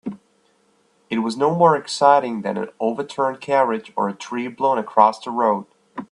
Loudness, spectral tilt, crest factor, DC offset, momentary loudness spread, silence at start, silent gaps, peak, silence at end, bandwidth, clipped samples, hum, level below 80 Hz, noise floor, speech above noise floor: -20 LUFS; -5.5 dB/octave; 20 dB; under 0.1%; 12 LU; 0.05 s; none; 0 dBFS; 0.1 s; 11 kHz; under 0.1%; none; -70 dBFS; -61 dBFS; 42 dB